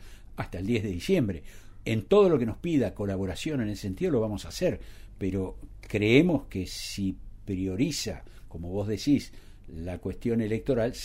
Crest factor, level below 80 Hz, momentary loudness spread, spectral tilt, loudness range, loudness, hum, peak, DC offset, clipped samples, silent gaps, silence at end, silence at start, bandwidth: 22 dB; -46 dBFS; 18 LU; -6 dB/octave; 4 LU; -28 LUFS; none; -6 dBFS; under 0.1%; under 0.1%; none; 0 s; 0 s; 16 kHz